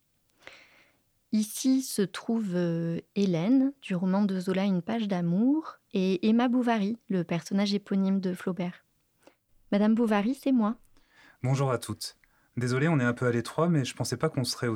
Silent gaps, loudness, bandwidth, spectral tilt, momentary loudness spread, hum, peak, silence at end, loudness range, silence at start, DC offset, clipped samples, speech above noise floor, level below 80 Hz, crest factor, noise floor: none; -28 LUFS; 16 kHz; -6 dB/octave; 7 LU; none; -12 dBFS; 0 s; 2 LU; 1.3 s; under 0.1%; under 0.1%; 41 dB; -68 dBFS; 16 dB; -68 dBFS